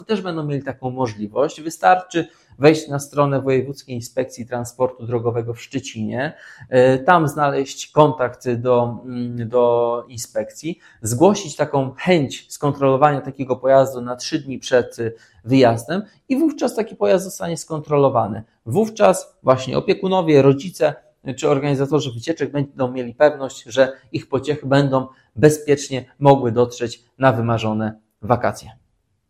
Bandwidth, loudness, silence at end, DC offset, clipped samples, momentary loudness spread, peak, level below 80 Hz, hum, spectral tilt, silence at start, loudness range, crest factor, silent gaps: 15 kHz; -19 LUFS; 0.6 s; under 0.1%; under 0.1%; 12 LU; 0 dBFS; -56 dBFS; none; -6 dB/octave; 0 s; 3 LU; 18 dB; none